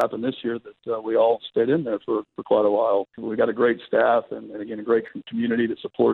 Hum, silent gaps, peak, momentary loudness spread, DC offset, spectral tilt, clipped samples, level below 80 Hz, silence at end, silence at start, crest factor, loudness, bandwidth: none; none; -8 dBFS; 11 LU; under 0.1%; -8 dB/octave; under 0.1%; -68 dBFS; 0 s; 0 s; 16 dB; -23 LUFS; 4.5 kHz